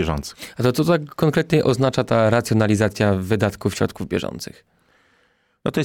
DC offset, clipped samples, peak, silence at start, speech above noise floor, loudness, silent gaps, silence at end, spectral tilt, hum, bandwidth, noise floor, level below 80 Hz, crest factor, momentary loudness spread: under 0.1%; under 0.1%; -6 dBFS; 0 s; 43 dB; -20 LUFS; none; 0 s; -6.5 dB/octave; none; 17.5 kHz; -63 dBFS; -44 dBFS; 14 dB; 11 LU